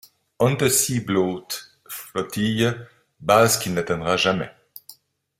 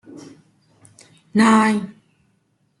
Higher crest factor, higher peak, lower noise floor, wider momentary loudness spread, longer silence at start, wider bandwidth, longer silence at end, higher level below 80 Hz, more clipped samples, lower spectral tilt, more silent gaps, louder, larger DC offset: about the same, 20 dB vs 18 dB; about the same, -2 dBFS vs -4 dBFS; second, -50 dBFS vs -65 dBFS; second, 18 LU vs 23 LU; first, 0.4 s vs 0.15 s; first, 16.5 kHz vs 11.5 kHz; second, 0.45 s vs 0.9 s; first, -56 dBFS vs -66 dBFS; neither; about the same, -4 dB/octave vs -5 dB/octave; neither; second, -21 LUFS vs -17 LUFS; neither